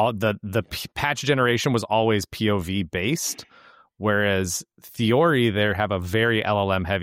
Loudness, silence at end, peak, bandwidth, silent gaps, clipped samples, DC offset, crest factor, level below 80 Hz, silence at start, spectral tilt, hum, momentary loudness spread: -23 LUFS; 0 s; -8 dBFS; 16.5 kHz; none; under 0.1%; under 0.1%; 16 dB; -50 dBFS; 0 s; -4.5 dB/octave; none; 8 LU